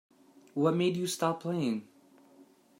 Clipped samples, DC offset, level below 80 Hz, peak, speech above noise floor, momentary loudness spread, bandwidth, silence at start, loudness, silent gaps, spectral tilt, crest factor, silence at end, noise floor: under 0.1%; under 0.1%; -80 dBFS; -14 dBFS; 30 dB; 9 LU; 16 kHz; 0.55 s; -31 LUFS; none; -5.5 dB/octave; 18 dB; 0.35 s; -60 dBFS